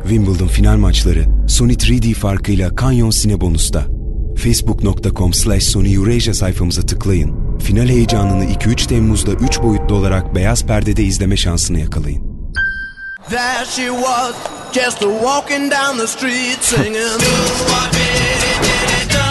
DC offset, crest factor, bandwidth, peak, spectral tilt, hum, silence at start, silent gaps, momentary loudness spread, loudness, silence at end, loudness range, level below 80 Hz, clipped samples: under 0.1%; 14 dB; 12.5 kHz; 0 dBFS; -4.5 dB/octave; none; 0 s; none; 6 LU; -15 LUFS; 0 s; 3 LU; -18 dBFS; under 0.1%